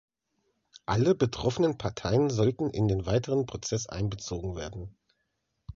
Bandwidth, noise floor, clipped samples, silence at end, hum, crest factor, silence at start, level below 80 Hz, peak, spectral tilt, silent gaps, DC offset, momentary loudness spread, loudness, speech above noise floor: 7.6 kHz; -79 dBFS; under 0.1%; 0.05 s; none; 18 dB; 0.9 s; -48 dBFS; -12 dBFS; -6 dB/octave; none; under 0.1%; 12 LU; -29 LUFS; 51 dB